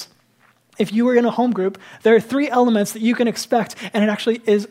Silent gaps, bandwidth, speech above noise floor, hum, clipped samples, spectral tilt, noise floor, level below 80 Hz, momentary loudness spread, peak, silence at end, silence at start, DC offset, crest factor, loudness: none; 16 kHz; 40 dB; none; under 0.1%; -5 dB/octave; -58 dBFS; -72 dBFS; 7 LU; -2 dBFS; 0.05 s; 0 s; under 0.1%; 16 dB; -18 LUFS